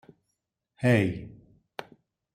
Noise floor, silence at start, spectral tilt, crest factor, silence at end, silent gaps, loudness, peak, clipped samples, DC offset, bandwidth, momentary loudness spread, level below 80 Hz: -82 dBFS; 0.8 s; -7.5 dB/octave; 22 dB; 0.5 s; none; -26 LUFS; -8 dBFS; under 0.1%; under 0.1%; 15 kHz; 20 LU; -60 dBFS